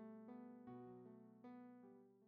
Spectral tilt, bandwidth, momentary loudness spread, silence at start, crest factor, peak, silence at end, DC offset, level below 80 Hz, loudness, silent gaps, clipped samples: -8.5 dB/octave; 4.9 kHz; 5 LU; 0 s; 12 dB; -48 dBFS; 0 s; under 0.1%; under -90 dBFS; -61 LUFS; none; under 0.1%